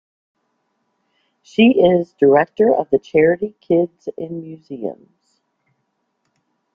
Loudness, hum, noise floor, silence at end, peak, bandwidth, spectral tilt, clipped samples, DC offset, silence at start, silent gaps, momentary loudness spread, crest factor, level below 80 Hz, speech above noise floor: -16 LUFS; none; -71 dBFS; 1.8 s; -2 dBFS; 7 kHz; -8 dB/octave; under 0.1%; under 0.1%; 1.6 s; none; 16 LU; 16 dB; -58 dBFS; 55 dB